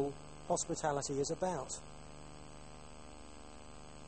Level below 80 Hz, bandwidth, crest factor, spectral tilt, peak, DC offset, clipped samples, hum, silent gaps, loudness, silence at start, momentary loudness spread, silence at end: -60 dBFS; 8.8 kHz; 20 dB; -4 dB/octave; -20 dBFS; 0.2%; under 0.1%; 50 Hz at -60 dBFS; none; -38 LUFS; 0 s; 18 LU; 0 s